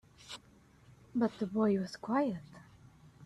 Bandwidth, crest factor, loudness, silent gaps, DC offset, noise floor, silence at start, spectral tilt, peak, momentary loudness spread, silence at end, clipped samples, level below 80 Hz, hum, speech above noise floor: 11.5 kHz; 18 dB; -34 LUFS; none; under 0.1%; -62 dBFS; 0.25 s; -7 dB/octave; -18 dBFS; 18 LU; 0 s; under 0.1%; -70 dBFS; none; 29 dB